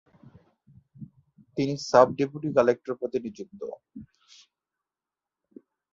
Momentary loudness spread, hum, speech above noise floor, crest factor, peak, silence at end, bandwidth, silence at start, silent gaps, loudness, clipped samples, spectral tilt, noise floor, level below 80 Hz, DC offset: 28 LU; none; over 65 dB; 24 dB; -4 dBFS; 1.9 s; 7.8 kHz; 1 s; none; -25 LUFS; under 0.1%; -6 dB/octave; under -90 dBFS; -66 dBFS; under 0.1%